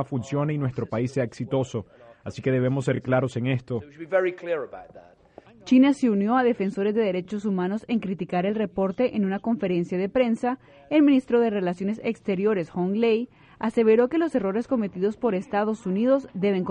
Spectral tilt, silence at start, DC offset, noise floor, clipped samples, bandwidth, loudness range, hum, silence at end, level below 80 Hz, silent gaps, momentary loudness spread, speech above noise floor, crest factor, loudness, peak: -8 dB/octave; 0 s; under 0.1%; -51 dBFS; under 0.1%; 9.4 kHz; 3 LU; none; 0 s; -60 dBFS; none; 10 LU; 27 dB; 16 dB; -24 LUFS; -8 dBFS